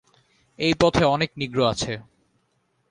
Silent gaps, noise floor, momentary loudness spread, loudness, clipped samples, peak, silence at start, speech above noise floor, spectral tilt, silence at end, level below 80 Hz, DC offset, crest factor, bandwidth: none; -69 dBFS; 10 LU; -22 LUFS; under 0.1%; -4 dBFS; 0.6 s; 48 dB; -5 dB/octave; 0.9 s; -46 dBFS; under 0.1%; 22 dB; 11 kHz